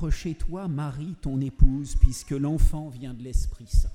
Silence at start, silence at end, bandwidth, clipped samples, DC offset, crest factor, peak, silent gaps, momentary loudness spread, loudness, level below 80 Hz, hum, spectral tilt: 0 s; 0 s; 12 kHz; under 0.1%; under 0.1%; 20 dB; -2 dBFS; none; 9 LU; -28 LUFS; -24 dBFS; none; -7 dB/octave